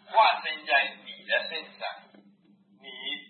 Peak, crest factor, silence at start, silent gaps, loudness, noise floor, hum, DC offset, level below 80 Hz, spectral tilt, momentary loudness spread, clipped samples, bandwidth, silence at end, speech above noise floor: -8 dBFS; 20 dB; 0.1 s; none; -27 LUFS; -61 dBFS; none; under 0.1%; under -90 dBFS; -5 dB/octave; 19 LU; under 0.1%; 4.5 kHz; 0.05 s; 34 dB